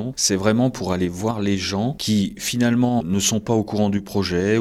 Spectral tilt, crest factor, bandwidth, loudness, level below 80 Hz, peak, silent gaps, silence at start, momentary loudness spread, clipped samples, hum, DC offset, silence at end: -4.5 dB/octave; 16 dB; 15.5 kHz; -21 LUFS; -48 dBFS; -4 dBFS; none; 0 s; 5 LU; under 0.1%; none; under 0.1%; 0 s